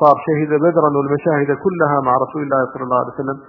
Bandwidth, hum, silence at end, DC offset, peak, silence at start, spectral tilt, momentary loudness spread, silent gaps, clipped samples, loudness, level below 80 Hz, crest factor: 5.6 kHz; none; 0.05 s; under 0.1%; 0 dBFS; 0 s; -11 dB/octave; 5 LU; none; under 0.1%; -17 LUFS; -60 dBFS; 16 dB